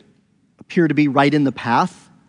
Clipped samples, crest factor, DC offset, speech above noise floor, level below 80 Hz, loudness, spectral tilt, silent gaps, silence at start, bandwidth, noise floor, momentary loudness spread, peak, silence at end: under 0.1%; 18 dB; under 0.1%; 42 dB; -66 dBFS; -18 LUFS; -7 dB/octave; none; 0.7 s; 10.5 kHz; -58 dBFS; 7 LU; 0 dBFS; 0.4 s